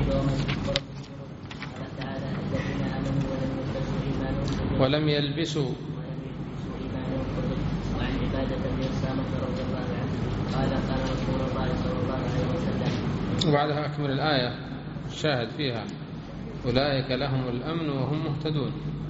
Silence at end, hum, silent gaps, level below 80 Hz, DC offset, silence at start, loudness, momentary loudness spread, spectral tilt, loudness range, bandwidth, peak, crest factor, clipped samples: 0 s; none; none; -40 dBFS; under 0.1%; 0 s; -28 LUFS; 11 LU; -5.5 dB/octave; 3 LU; 7.6 kHz; -2 dBFS; 26 dB; under 0.1%